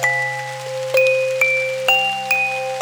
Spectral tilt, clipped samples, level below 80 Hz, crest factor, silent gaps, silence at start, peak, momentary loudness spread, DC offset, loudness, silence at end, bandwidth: -1.5 dB/octave; under 0.1%; -80 dBFS; 18 dB; none; 0 s; -2 dBFS; 9 LU; under 0.1%; -17 LUFS; 0 s; over 20 kHz